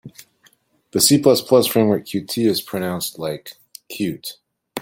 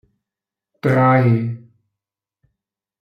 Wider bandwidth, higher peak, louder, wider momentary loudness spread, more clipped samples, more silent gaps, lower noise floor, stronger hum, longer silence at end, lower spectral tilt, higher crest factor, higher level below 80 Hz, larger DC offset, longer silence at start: first, 17 kHz vs 5.2 kHz; about the same, 0 dBFS vs -2 dBFS; about the same, -18 LUFS vs -17 LUFS; first, 19 LU vs 14 LU; neither; neither; second, -58 dBFS vs -87 dBFS; neither; second, 0 s vs 1.45 s; second, -4 dB/octave vs -9.5 dB/octave; about the same, 20 dB vs 18 dB; about the same, -60 dBFS vs -60 dBFS; neither; second, 0.05 s vs 0.85 s